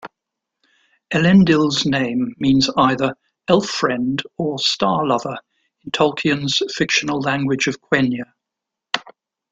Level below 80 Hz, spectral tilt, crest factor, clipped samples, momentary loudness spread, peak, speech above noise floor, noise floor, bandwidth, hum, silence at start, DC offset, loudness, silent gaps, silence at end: -54 dBFS; -5 dB/octave; 18 dB; under 0.1%; 11 LU; 0 dBFS; 66 dB; -83 dBFS; 8.4 kHz; none; 0.05 s; under 0.1%; -18 LUFS; none; 0.4 s